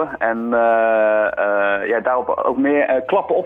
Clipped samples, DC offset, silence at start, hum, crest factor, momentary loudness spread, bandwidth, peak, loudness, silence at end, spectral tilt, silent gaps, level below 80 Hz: under 0.1%; under 0.1%; 0 s; none; 14 dB; 4 LU; 3.8 kHz; -4 dBFS; -17 LUFS; 0 s; -8 dB/octave; none; -56 dBFS